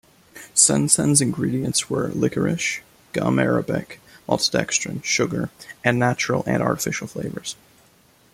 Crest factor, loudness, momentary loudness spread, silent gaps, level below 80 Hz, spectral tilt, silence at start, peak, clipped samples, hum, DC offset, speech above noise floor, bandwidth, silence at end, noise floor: 22 dB; -21 LUFS; 14 LU; none; -54 dBFS; -3.5 dB/octave; 0.35 s; 0 dBFS; under 0.1%; none; under 0.1%; 34 dB; 16 kHz; 0.8 s; -56 dBFS